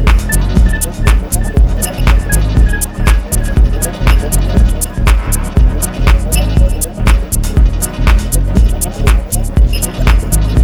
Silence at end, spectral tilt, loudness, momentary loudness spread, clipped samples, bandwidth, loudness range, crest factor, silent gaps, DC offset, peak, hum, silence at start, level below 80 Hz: 0 s; -5 dB/octave; -13 LUFS; 3 LU; under 0.1%; 16.5 kHz; 0 LU; 10 dB; none; under 0.1%; 0 dBFS; none; 0 s; -10 dBFS